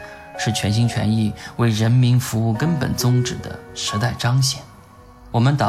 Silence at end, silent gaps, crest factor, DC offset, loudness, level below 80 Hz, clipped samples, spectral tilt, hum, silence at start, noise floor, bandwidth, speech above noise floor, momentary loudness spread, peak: 0 s; none; 14 dB; under 0.1%; -20 LUFS; -46 dBFS; under 0.1%; -5.5 dB/octave; none; 0 s; -44 dBFS; 15 kHz; 26 dB; 9 LU; -6 dBFS